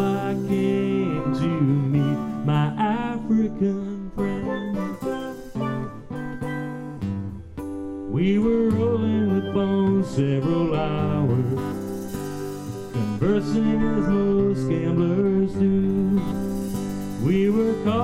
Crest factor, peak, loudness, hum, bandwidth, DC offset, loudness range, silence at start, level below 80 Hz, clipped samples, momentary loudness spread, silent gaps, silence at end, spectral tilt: 14 dB; -8 dBFS; -24 LUFS; none; 15.5 kHz; under 0.1%; 7 LU; 0 s; -44 dBFS; under 0.1%; 11 LU; none; 0 s; -8 dB/octave